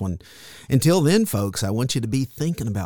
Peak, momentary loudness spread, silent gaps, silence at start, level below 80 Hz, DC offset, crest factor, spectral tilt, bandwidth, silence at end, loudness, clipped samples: -6 dBFS; 16 LU; none; 0 s; -48 dBFS; 0.5%; 16 dB; -5.5 dB/octave; 19 kHz; 0 s; -21 LUFS; under 0.1%